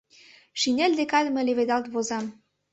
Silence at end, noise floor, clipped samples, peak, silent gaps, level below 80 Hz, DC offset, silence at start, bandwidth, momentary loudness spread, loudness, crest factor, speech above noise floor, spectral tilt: 0.4 s; -54 dBFS; under 0.1%; -8 dBFS; none; -70 dBFS; under 0.1%; 0.55 s; 8.2 kHz; 10 LU; -25 LUFS; 18 dB; 30 dB; -2.5 dB/octave